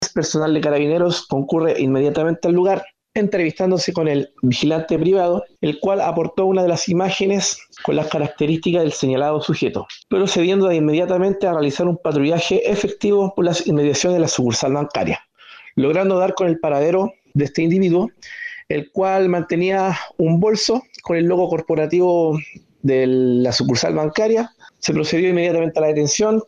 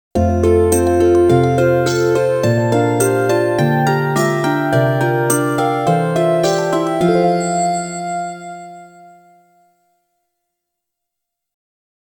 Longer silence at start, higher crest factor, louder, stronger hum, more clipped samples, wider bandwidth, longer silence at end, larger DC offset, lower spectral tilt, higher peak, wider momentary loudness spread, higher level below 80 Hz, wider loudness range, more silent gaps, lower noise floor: second, 0 s vs 0.15 s; second, 10 dB vs 16 dB; second, -18 LUFS vs -15 LUFS; neither; neither; second, 10 kHz vs 19 kHz; second, 0.05 s vs 3.3 s; neither; about the same, -5 dB/octave vs -6 dB/octave; second, -8 dBFS vs 0 dBFS; second, 6 LU vs 9 LU; second, -54 dBFS vs -44 dBFS; second, 1 LU vs 10 LU; neither; second, -44 dBFS vs -79 dBFS